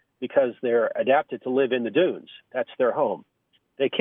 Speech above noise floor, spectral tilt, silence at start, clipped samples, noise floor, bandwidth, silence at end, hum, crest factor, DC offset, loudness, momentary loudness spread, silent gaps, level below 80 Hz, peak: 28 dB; -9 dB/octave; 0.2 s; under 0.1%; -52 dBFS; 3.9 kHz; 0 s; none; 18 dB; under 0.1%; -24 LUFS; 9 LU; none; -82 dBFS; -6 dBFS